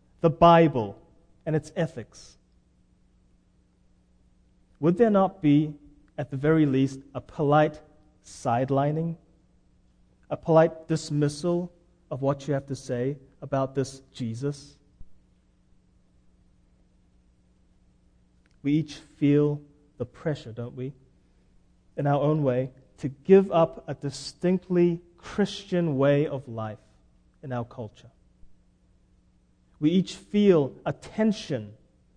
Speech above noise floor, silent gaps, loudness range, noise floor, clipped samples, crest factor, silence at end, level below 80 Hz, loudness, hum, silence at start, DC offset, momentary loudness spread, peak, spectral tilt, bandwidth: 38 dB; none; 11 LU; -63 dBFS; under 0.1%; 22 dB; 0.45 s; -56 dBFS; -25 LUFS; none; 0.25 s; under 0.1%; 17 LU; -4 dBFS; -7.5 dB/octave; 10 kHz